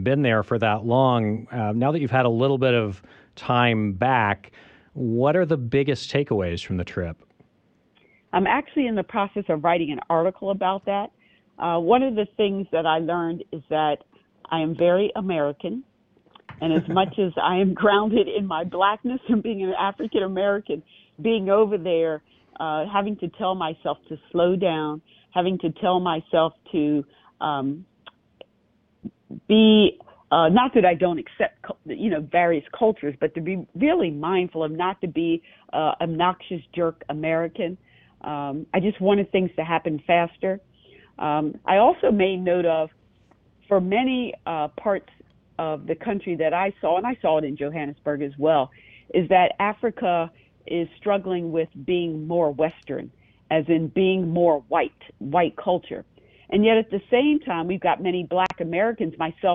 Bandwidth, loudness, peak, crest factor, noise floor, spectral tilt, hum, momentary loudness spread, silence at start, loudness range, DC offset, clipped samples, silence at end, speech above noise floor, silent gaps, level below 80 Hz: 8 kHz; -23 LUFS; -6 dBFS; 18 dB; -64 dBFS; -8 dB/octave; none; 11 LU; 0 s; 4 LU; under 0.1%; under 0.1%; 0 s; 42 dB; none; -58 dBFS